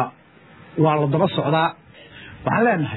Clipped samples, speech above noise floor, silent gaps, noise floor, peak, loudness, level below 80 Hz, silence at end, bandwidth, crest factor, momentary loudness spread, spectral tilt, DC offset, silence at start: under 0.1%; 30 dB; none; -49 dBFS; -4 dBFS; -20 LUFS; -58 dBFS; 0 s; 4.1 kHz; 16 dB; 14 LU; -10.5 dB/octave; under 0.1%; 0 s